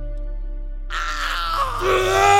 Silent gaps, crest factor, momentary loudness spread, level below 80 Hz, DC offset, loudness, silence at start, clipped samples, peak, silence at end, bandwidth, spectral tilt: none; 18 dB; 16 LU; -28 dBFS; under 0.1%; -21 LUFS; 0 s; under 0.1%; -2 dBFS; 0 s; 17 kHz; -3.5 dB/octave